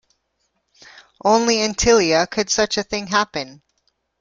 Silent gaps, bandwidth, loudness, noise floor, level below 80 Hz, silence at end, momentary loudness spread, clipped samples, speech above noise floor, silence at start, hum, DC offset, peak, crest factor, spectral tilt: none; 9.4 kHz; -18 LUFS; -70 dBFS; -44 dBFS; 0.65 s; 9 LU; under 0.1%; 52 dB; 1.25 s; none; under 0.1%; -2 dBFS; 18 dB; -2.5 dB/octave